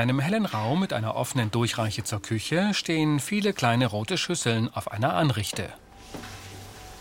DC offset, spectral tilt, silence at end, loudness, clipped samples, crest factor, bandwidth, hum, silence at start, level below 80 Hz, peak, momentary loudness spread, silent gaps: under 0.1%; -5 dB/octave; 0 s; -26 LUFS; under 0.1%; 20 dB; 17 kHz; none; 0 s; -56 dBFS; -6 dBFS; 17 LU; none